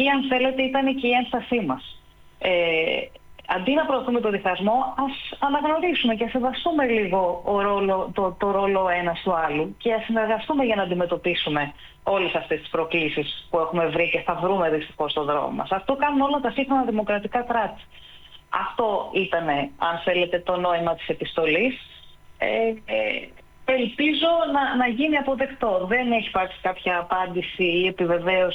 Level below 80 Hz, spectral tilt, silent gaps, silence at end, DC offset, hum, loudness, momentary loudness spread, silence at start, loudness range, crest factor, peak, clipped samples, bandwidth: -52 dBFS; -7 dB/octave; none; 0 s; under 0.1%; none; -23 LUFS; 6 LU; 0 s; 2 LU; 14 dB; -8 dBFS; under 0.1%; 18 kHz